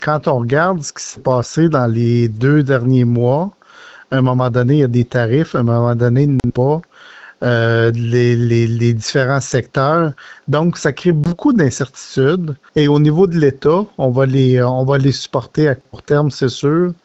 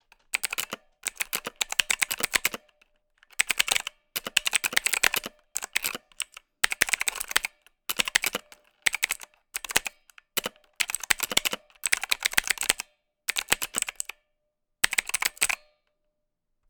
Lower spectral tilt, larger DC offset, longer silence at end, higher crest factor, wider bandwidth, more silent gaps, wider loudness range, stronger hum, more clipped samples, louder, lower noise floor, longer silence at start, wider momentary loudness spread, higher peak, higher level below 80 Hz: first, -7 dB/octave vs 1.5 dB/octave; neither; second, 0.1 s vs 1.15 s; second, 12 dB vs 26 dB; second, 8.2 kHz vs over 20 kHz; neither; about the same, 2 LU vs 2 LU; neither; neither; first, -15 LUFS vs -27 LUFS; second, -41 dBFS vs -78 dBFS; second, 0 s vs 0.35 s; second, 6 LU vs 12 LU; about the same, -2 dBFS vs -4 dBFS; first, -46 dBFS vs -58 dBFS